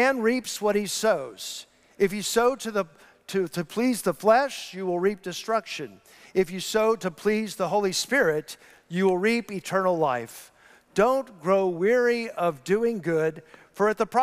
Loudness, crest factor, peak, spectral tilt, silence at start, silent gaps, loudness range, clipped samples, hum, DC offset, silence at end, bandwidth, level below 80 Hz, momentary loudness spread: -25 LUFS; 18 dB; -8 dBFS; -4.5 dB/octave; 0 s; none; 2 LU; under 0.1%; none; under 0.1%; 0 s; 16 kHz; -62 dBFS; 11 LU